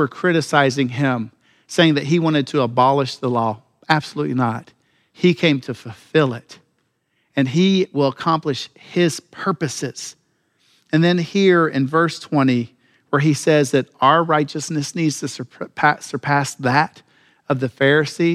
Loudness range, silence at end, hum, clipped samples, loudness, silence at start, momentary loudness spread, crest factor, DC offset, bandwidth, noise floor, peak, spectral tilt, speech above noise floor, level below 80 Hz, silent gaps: 4 LU; 0 s; none; under 0.1%; -19 LUFS; 0 s; 11 LU; 18 dB; under 0.1%; 14 kHz; -68 dBFS; 0 dBFS; -5.5 dB/octave; 50 dB; -66 dBFS; none